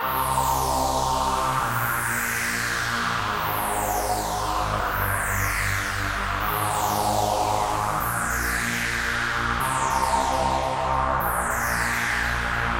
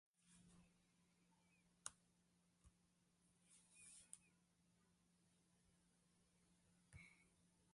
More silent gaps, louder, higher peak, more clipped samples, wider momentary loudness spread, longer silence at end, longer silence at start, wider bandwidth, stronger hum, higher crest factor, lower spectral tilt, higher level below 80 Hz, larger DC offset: neither; first, -24 LUFS vs -63 LUFS; first, -10 dBFS vs -32 dBFS; neither; second, 2 LU vs 9 LU; about the same, 0 s vs 0 s; second, 0 s vs 0.15 s; first, 16.5 kHz vs 11.5 kHz; neither; second, 14 dB vs 38 dB; about the same, -3 dB/octave vs -2 dB/octave; first, -36 dBFS vs -86 dBFS; neither